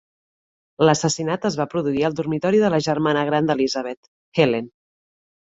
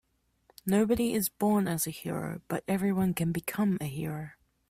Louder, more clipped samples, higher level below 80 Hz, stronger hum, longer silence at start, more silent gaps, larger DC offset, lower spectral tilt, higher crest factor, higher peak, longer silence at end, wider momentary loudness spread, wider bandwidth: first, -21 LUFS vs -30 LUFS; neither; about the same, -60 dBFS vs -58 dBFS; neither; first, 0.8 s vs 0.65 s; first, 3.97-4.32 s vs none; neither; about the same, -5 dB/octave vs -6 dB/octave; about the same, 20 dB vs 18 dB; first, -2 dBFS vs -12 dBFS; first, 0.9 s vs 0.4 s; about the same, 9 LU vs 9 LU; second, 8 kHz vs 16 kHz